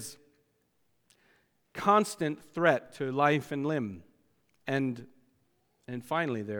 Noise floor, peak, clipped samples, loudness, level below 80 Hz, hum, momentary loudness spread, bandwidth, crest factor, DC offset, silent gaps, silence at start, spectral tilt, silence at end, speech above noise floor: -75 dBFS; -10 dBFS; under 0.1%; -30 LUFS; -74 dBFS; none; 18 LU; 20 kHz; 24 dB; under 0.1%; none; 0 s; -5.5 dB/octave; 0 s; 45 dB